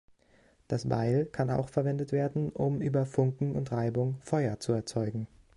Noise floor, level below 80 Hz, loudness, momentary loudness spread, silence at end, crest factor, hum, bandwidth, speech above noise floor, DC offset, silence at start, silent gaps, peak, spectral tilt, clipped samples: -64 dBFS; -58 dBFS; -31 LUFS; 5 LU; 0.3 s; 18 dB; none; 11.5 kHz; 34 dB; under 0.1%; 0.7 s; none; -14 dBFS; -8 dB/octave; under 0.1%